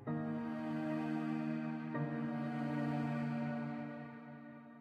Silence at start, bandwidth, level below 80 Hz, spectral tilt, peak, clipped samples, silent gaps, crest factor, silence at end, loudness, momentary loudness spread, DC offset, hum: 0 s; 8 kHz; -80 dBFS; -9 dB/octave; -28 dBFS; under 0.1%; none; 12 dB; 0 s; -40 LUFS; 12 LU; under 0.1%; none